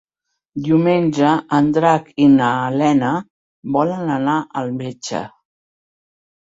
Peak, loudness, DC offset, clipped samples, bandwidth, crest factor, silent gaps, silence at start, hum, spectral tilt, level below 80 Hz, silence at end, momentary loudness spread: -2 dBFS; -17 LUFS; under 0.1%; under 0.1%; 7.8 kHz; 16 dB; 3.30-3.63 s; 0.55 s; none; -6.5 dB/octave; -58 dBFS; 1.2 s; 12 LU